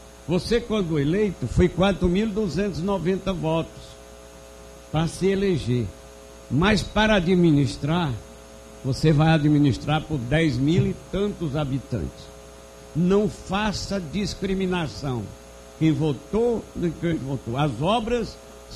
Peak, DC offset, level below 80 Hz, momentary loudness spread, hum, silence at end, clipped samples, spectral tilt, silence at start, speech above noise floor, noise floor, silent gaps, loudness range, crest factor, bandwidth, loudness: -6 dBFS; under 0.1%; -40 dBFS; 16 LU; none; 0 s; under 0.1%; -6.5 dB/octave; 0 s; 21 dB; -44 dBFS; none; 5 LU; 18 dB; 13.5 kHz; -23 LUFS